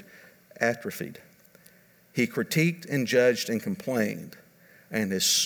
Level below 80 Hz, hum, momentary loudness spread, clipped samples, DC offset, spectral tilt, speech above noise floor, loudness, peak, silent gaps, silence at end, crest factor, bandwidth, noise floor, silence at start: -74 dBFS; none; 14 LU; under 0.1%; under 0.1%; -3.5 dB/octave; 31 dB; -27 LUFS; -10 dBFS; none; 0 s; 20 dB; over 20 kHz; -58 dBFS; 0.15 s